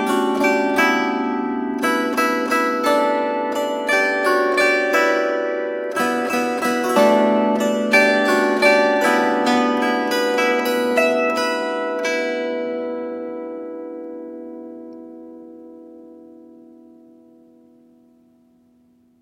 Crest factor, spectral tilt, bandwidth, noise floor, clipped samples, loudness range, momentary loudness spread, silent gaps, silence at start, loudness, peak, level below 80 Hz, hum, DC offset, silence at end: 18 dB; -3.5 dB/octave; 16.5 kHz; -57 dBFS; under 0.1%; 16 LU; 17 LU; none; 0 s; -18 LUFS; -2 dBFS; -68 dBFS; none; under 0.1%; 2.9 s